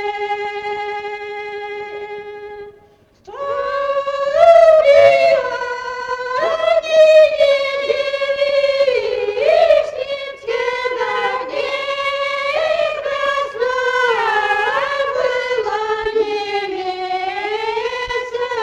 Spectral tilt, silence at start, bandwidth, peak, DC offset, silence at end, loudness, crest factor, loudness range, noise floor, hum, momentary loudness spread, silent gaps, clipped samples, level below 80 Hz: -2.5 dB/octave; 0 s; 9.6 kHz; 0 dBFS; under 0.1%; 0 s; -16 LUFS; 16 dB; 7 LU; -50 dBFS; none; 16 LU; none; under 0.1%; -52 dBFS